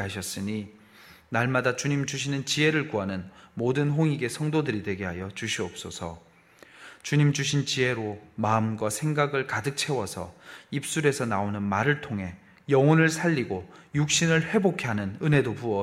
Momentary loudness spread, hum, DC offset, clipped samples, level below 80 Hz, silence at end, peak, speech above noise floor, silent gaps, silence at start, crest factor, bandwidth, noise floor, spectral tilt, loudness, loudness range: 13 LU; none; under 0.1%; under 0.1%; -60 dBFS; 0 s; -8 dBFS; 28 dB; none; 0 s; 18 dB; 15 kHz; -54 dBFS; -5 dB/octave; -26 LUFS; 4 LU